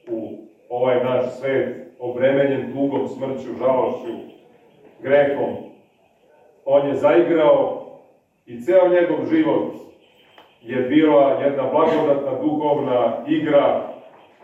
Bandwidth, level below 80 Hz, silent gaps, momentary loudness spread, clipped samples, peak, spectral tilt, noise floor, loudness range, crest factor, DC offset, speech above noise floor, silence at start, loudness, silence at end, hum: 7.6 kHz; -68 dBFS; none; 15 LU; under 0.1%; -4 dBFS; -8 dB/octave; -57 dBFS; 5 LU; 16 dB; under 0.1%; 39 dB; 0.05 s; -19 LUFS; 0.4 s; none